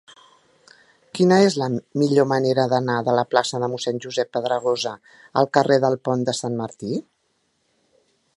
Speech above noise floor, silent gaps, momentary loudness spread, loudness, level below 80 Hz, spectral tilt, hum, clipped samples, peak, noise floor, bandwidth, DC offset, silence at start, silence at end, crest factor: 48 dB; none; 11 LU; -21 LUFS; -66 dBFS; -5.5 dB/octave; none; under 0.1%; 0 dBFS; -69 dBFS; 11.5 kHz; under 0.1%; 1.15 s; 1.35 s; 22 dB